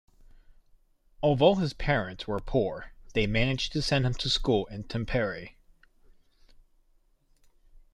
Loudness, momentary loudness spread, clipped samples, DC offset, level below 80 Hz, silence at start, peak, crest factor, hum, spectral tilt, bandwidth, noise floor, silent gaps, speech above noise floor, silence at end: -28 LUFS; 12 LU; under 0.1%; under 0.1%; -42 dBFS; 1.2 s; -8 dBFS; 22 dB; none; -5.5 dB/octave; 11.5 kHz; -65 dBFS; none; 38 dB; 2.45 s